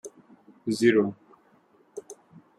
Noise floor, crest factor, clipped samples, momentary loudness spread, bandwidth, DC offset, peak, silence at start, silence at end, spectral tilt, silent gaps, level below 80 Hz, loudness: -62 dBFS; 22 dB; under 0.1%; 26 LU; 13 kHz; under 0.1%; -8 dBFS; 0.05 s; 0.45 s; -5.5 dB/octave; none; -74 dBFS; -25 LUFS